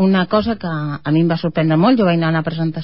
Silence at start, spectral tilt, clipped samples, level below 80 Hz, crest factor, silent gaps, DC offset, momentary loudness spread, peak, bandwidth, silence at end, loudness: 0 s; -12.5 dB/octave; under 0.1%; -46 dBFS; 14 dB; none; 0.8%; 8 LU; -2 dBFS; 5.8 kHz; 0 s; -16 LUFS